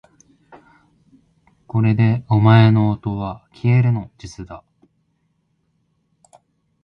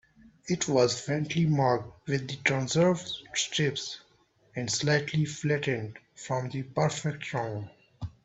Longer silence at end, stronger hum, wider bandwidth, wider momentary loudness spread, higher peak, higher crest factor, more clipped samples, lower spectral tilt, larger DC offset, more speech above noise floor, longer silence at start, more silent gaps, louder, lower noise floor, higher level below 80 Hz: first, 2.25 s vs 0.15 s; neither; second, 6.6 kHz vs 8.4 kHz; first, 24 LU vs 16 LU; first, 0 dBFS vs -8 dBFS; about the same, 20 dB vs 22 dB; neither; first, -8.5 dB/octave vs -4.5 dB/octave; neither; first, 51 dB vs 36 dB; first, 1.75 s vs 0.45 s; neither; first, -17 LUFS vs -29 LUFS; about the same, -67 dBFS vs -65 dBFS; first, -48 dBFS vs -62 dBFS